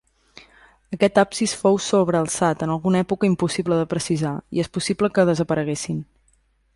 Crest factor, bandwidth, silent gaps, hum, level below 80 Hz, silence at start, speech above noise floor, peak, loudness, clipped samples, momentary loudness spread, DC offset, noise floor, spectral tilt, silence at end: 18 dB; 11.5 kHz; none; none; -54 dBFS; 0.9 s; 42 dB; -4 dBFS; -21 LUFS; under 0.1%; 7 LU; under 0.1%; -62 dBFS; -5.5 dB/octave; 0.75 s